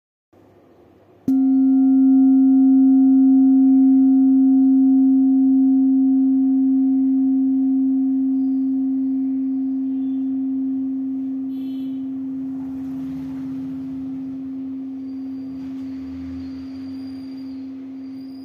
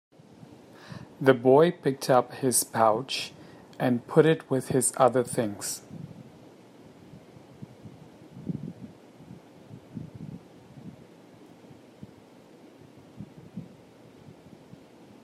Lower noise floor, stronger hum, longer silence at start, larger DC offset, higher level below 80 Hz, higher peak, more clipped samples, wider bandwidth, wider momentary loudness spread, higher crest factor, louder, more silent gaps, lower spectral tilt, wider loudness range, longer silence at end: about the same, -51 dBFS vs -52 dBFS; neither; first, 1.25 s vs 0.9 s; neither; first, -64 dBFS vs -70 dBFS; second, -8 dBFS vs -4 dBFS; neither; second, 1.5 kHz vs 16 kHz; second, 18 LU vs 27 LU; second, 10 dB vs 26 dB; first, -17 LUFS vs -25 LUFS; neither; first, -9.5 dB/octave vs -4.5 dB/octave; second, 16 LU vs 24 LU; second, 0 s vs 1.6 s